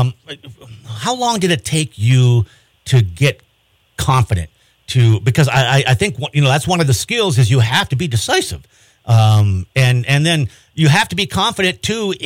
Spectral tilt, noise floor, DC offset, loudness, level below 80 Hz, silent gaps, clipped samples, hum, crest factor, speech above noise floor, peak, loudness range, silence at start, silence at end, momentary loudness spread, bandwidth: -5 dB/octave; -58 dBFS; under 0.1%; -15 LUFS; -42 dBFS; none; under 0.1%; none; 12 dB; 44 dB; -2 dBFS; 2 LU; 0 s; 0 s; 12 LU; 16 kHz